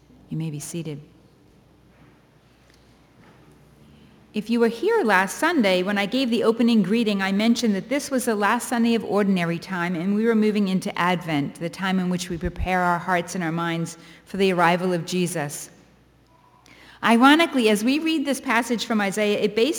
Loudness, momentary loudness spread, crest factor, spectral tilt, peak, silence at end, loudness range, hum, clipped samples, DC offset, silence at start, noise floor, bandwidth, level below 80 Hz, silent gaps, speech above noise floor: -22 LUFS; 11 LU; 20 dB; -5 dB/octave; -4 dBFS; 0 s; 5 LU; none; under 0.1%; under 0.1%; 0.3 s; -56 dBFS; over 20 kHz; -48 dBFS; none; 34 dB